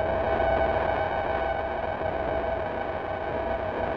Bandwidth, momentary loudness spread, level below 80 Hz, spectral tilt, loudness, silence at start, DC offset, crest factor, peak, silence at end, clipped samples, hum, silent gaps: 6.2 kHz; 6 LU; -42 dBFS; -8 dB/octave; -28 LUFS; 0 s; under 0.1%; 16 dB; -12 dBFS; 0 s; under 0.1%; none; none